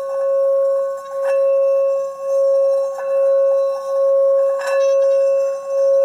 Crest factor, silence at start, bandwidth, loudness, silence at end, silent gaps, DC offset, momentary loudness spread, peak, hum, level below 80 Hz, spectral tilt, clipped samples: 6 dB; 0 s; 10 kHz; -17 LUFS; 0 s; none; under 0.1%; 5 LU; -10 dBFS; none; -80 dBFS; -1.5 dB/octave; under 0.1%